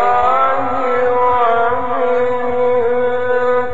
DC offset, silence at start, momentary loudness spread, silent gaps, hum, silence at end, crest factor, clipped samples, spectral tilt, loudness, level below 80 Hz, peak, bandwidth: 8%; 0 s; 4 LU; none; none; 0 s; 12 dB; under 0.1%; -3 dB/octave; -15 LUFS; -46 dBFS; -2 dBFS; 7.6 kHz